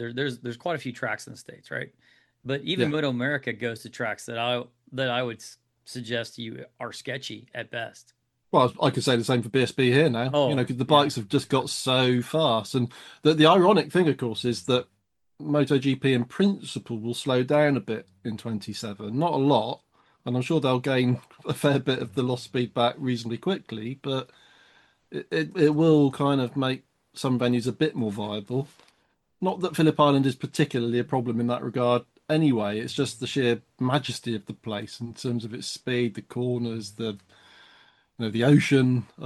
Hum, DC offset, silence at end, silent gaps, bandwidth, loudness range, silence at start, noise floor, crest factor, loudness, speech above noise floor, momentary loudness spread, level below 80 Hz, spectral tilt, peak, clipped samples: none; under 0.1%; 0 s; none; 12.5 kHz; 8 LU; 0 s; -70 dBFS; 20 dB; -25 LUFS; 44 dB; 14 LU; -68 dBFS; -6 dB/octave; -4 dBFS; under 0.1%